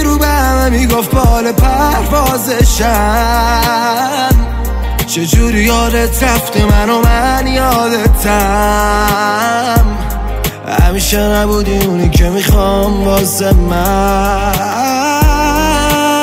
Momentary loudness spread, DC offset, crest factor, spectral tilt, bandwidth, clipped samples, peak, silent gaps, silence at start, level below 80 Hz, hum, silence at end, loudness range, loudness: 3 LU; under 0.1%; 10 dB; -4.5 dB/octave; 16.5 kHz; under 0.1%; 0 dBFS; none; 0 s; -14 dBFS; none; 0 s; 1 LU; -11 LUFS